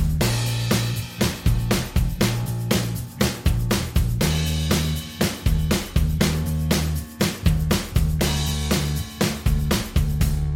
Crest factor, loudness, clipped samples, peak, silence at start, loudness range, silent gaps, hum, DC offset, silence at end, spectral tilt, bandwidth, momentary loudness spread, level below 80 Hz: 18 dB; -23 LUFS; under 0.1%; -4 dBFS; 0 s; 1 LU; none; none; under 0.1%; 0 s; -5 dB/octave; 17 kHz; 3 LU; -28 dBFS